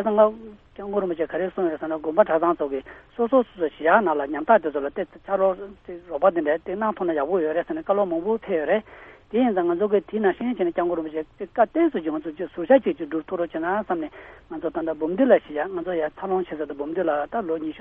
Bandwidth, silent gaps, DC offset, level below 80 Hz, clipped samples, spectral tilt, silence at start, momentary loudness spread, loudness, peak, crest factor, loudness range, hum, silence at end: 3.9 kHz; none; under 0.1%; -56 dBFS; under 0.1%; -9.5 dB/octave; 0 s; 12 LU; -24 LUFS; -4 dBFS; 20 dB; 2 LU; none; 0 s